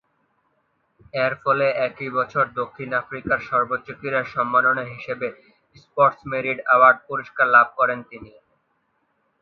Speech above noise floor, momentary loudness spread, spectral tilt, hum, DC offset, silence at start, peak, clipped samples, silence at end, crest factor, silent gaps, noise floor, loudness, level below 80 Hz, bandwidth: 48 dB; 14 LU; -7 dB/octave; none; under 0.1%; 1.15 s; 0 dBFS; under 0.1%; 1.15 s; 22 dB; none; -69 dBFS; -21 LUFS; -62 dBFS; 6.2 kHz